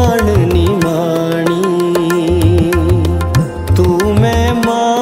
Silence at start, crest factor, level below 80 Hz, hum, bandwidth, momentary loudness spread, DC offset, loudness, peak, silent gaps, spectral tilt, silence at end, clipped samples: 0 s; 12 dB; -24 dBFS; none; 16.5 kHz; 3 LU; under 0.1%; -12 LUFS; 0 dBFS; none; -6.5 dB/octave; 0 s; under 0.1%